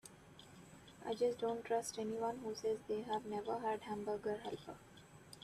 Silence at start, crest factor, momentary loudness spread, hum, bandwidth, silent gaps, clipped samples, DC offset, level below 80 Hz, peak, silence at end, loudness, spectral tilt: 0.05 s; 16 dB; 20 LU; none; 14 kHz; none; under 0.1%; under 0.1%; -74 dBFS; -26 dBFS; 0 s; -42 LUFS; -4.5 dB/octave